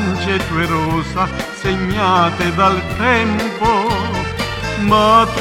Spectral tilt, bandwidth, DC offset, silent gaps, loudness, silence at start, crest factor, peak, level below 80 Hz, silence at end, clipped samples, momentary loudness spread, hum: -5.5 dB/octave; 17 kHz; under 0.1%; none; -16 LUFS; 0 s; 16 dB; 0 dBFS; -32 dBFS; 0 s; under 0.1%; 8 LU; none